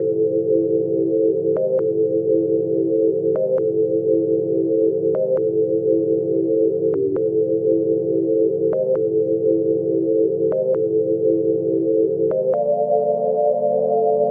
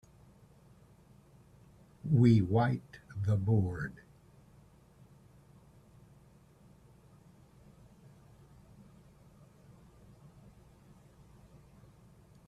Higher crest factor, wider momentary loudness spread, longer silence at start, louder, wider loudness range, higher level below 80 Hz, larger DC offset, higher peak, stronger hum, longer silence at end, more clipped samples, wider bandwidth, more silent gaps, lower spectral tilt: second, 12 dB vs 22 dB; second, 1 LU vs 20 LU; second, 0 s vs 2.05 s; first, -19 LUFS vs -30 LUFS; second, 0 LU vs 8 LU; second, -72 dBFS vs -64 dBFS; neither; first, -6 dBFS vs -14 dBFS; neither; second, 0 s vs 8.55 s; neither; second, 1.8 kHz vs 8.4 kHz; neither; first, -13 dB/octave vs -9 dB/octave